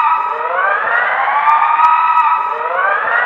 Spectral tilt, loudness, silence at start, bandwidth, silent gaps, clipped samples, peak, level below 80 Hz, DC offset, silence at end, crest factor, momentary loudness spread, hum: -2.5 dB/octave; -13 LUFS; 0 s; 6.6 kHz; none; under 0.1%; 0 dBFS; -66 dBFS; under 0.1%; 0 s; 14 dB; 5 LU; none